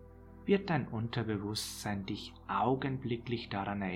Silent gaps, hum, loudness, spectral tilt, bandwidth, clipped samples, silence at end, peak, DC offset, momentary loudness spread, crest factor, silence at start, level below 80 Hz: none; none; -35 LUFS; -5.5 dB/octave; 16.5 kHz; under 0.1%; 0 s; -16 dBFS; under 0.1%; 9 LU; 20 dB; 0 s; -58 dBFS